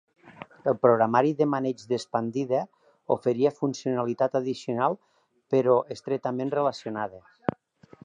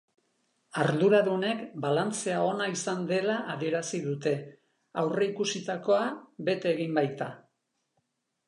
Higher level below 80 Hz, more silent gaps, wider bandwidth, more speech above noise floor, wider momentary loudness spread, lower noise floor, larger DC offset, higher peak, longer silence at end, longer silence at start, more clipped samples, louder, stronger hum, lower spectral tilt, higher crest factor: first, -70 dBFS vs -82 dBFS; neither; about the same, 10 kHz vs 11 kHz; second, 28 dB vs 50 dB; about the same, 11 LU vs 9 LU; second, -54 dBFS vs -79 dBFS; neither; first, -6 dBFS vs -12 dBFS; second, 0.85 s vs 1.1 s; second, 0.25 s vs 0.75 s; neither; first, -26 LUFS vs -29 LUFS; neither; first, -7 dB/octave vs -5 dB/octave; about the same, 20 dB vs 18 dB